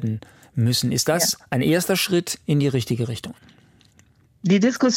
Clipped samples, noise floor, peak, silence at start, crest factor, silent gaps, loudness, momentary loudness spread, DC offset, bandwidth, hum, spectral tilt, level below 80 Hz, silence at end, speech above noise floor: under 0.1%; -56 dBFS; -6 dBFS; 0 s; 16 dB; none; -21 LUFS; 11 LU; under 0.1%; 17 kHz; none; -4.5 dB/octave; -58 dBFS; 0 s; 35 dB